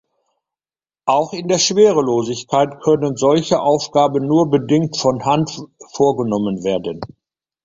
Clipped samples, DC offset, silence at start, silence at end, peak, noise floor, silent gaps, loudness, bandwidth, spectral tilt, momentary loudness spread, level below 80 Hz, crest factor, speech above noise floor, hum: under 0.1%; under 0.1%; 1.05 s; 0.6 s; -2 dBFS; under -90 dBFS; none; -17 LUFS; 7.8 kHz; -5 dB/octave; 11 LU; -54 dBFS; 16 dB; over 74 dB; none